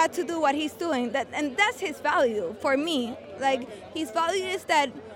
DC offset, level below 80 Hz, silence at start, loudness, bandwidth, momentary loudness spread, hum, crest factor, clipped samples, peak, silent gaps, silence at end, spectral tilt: under 0.1%; -68 dBFS; 0 s; -26 LUFS; 17 kHz; 6 LU; none; 18 dB; under 0.1%; -8 dBFS; none; 0 s; -3 dB/octave